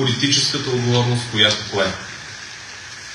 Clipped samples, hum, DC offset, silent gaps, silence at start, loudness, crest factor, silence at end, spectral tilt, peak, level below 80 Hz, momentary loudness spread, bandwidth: under 0.1%; none; under 0.1%; none; 0 s; -17 LUFS; 20 dB; 0 s; -3.5 dB/octave; 0 dBFS; -54 dBFS; 17 LU; 12 kHz